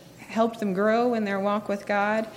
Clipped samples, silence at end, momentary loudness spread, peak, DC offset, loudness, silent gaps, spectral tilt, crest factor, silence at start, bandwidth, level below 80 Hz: under 0.1%; 0 s; 5 LU; -10 dBFS; under 0.1%; -25 LUFS; none; -6.5 dB/octave; 16 dB; 0 s; 15.5 kHz; -68 dBFS